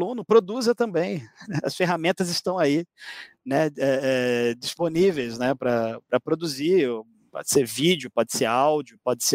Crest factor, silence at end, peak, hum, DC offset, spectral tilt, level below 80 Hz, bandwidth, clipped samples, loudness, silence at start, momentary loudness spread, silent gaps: 18 dB; 0 s; -6 dBFS; none; under 0.1%; -4 dB/octave; -66 dBFS; 16 kHz; under 0.1%; -24 LUFS; 0 s; 9 LU; none